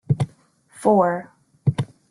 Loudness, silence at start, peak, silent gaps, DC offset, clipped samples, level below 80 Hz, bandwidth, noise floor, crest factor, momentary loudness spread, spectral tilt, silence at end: -22 LUFS; 0.1 s; -4 dBFS; none; under 0.1%; under 0.1%; -52 dBFS; 11.5 kHz; -54 dBFS; 18 dB; 12 LU; -8 dB/octave; 0.25 s